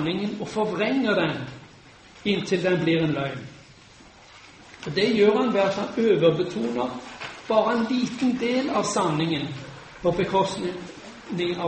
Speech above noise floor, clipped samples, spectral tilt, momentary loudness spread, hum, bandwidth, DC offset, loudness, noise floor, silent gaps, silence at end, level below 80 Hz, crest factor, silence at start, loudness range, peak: 26 dB; under 0.1%; -5.5 dB/octave; 17 LU; none; 8.8 kHz; under 0.1%; -24 LUFS; -50 dBFS; none; 0 s; -58 dBFS; 18 dB; 0 s; 4 LU; -8 dBFS